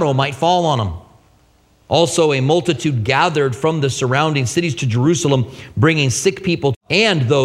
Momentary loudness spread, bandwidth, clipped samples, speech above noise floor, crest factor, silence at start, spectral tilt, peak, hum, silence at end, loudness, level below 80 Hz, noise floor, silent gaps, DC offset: 5 LU; 14 kHz; under 0.1%; 38 dB; 16 dB; 0 s; -5 dB/octave; 0 dBFS; none; 0 s; -16 LUFS; -46 dBFS; -54 dBFS; 6.76-6.81 s; under 0.1%